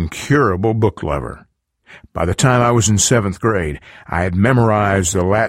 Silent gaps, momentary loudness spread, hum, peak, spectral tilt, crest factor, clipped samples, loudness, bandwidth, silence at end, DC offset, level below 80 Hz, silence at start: none; 11 LU; none; -2 dBFS; -5 dB/octave; 14 dB; under 0.1%; -16 LUFS; 16 kHz; 0 s; under 0.1%; -36 dBFS; 0 s